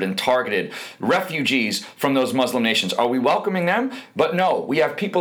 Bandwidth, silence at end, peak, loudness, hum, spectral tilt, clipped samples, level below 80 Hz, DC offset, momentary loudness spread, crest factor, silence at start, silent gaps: over 20 kHz; 0 s; -6 dBFS; -21 LUFS; none; -4.5 dB/octave; under 0.1%; -70 dBFS; under 0.1%; 5 LU; 16 dB; 0 s; none